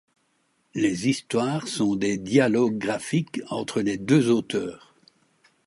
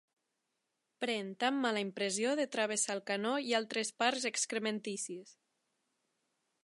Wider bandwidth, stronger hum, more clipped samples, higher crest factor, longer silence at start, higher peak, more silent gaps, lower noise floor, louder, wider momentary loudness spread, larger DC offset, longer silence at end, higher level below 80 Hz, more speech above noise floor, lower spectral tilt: about the same, 11.5 kHz vs 11.5 kHz; neither; neither; about the same, 18 dB vs 22 dB; second, 0.75 s vs 1 s; first, -6 dBFS vs -14 dBFS; neither; second, -69 dBFS vs -85 dBFS; first, -24 LUFS vs -35 LUFS; first, 10 LU vs 7 LU; neither; second, 0.9 s vs 1.35 s; first, -62 dBFS vs -90 dBFS; second, 46 dB vs 50 dB; first, -5.5 dB/octave vs -2 dB/octave